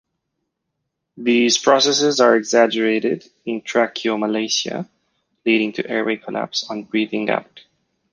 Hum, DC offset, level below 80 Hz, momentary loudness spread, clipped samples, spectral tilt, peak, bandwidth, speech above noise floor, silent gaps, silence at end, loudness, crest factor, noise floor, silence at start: none; under 0.1%; -68 dBFS; 12 LU; under 0.1%; -3 dB/octave; -2 dBFS; 10 kHz; 58 dB; none; 0.55 s; -19 LUFS; 18 dB; -77 dBFS; 1.15 s